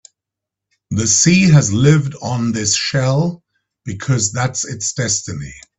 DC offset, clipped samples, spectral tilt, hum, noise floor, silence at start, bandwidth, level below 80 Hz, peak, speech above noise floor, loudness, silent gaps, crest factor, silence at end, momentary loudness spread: under 0.1%; under 0.1%; -4 dB/octave; none; -84 dBFS; 0.9 s; 8.4 kHz; -46 dBFS; 0 dBFS; 68 dB; -15 LUFS; none; 16 dB; 0.2 s; 14 LU